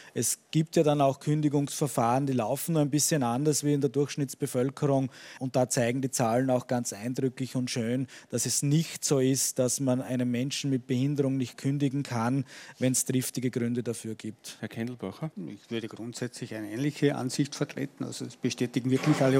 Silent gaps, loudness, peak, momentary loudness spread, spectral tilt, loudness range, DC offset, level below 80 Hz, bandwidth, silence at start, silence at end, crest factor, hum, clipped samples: none; -29 LUFS; -10 dBFS; 11 LU; -5 dB/octave; 6 LU; under 0.1%; -70 dBFS; 17 kHz; 0 s; 0 s; 18 dB; none; under 0.1%